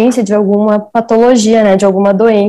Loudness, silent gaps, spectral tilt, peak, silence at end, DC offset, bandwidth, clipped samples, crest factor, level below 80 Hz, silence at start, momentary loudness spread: -9 LUFS; none; -6 dB/octave; 0 dBFS; 0 s; under 0.1%; 12 kHz; 0.5%; 8 dB; -48 dBFS; 0 s; 4 LU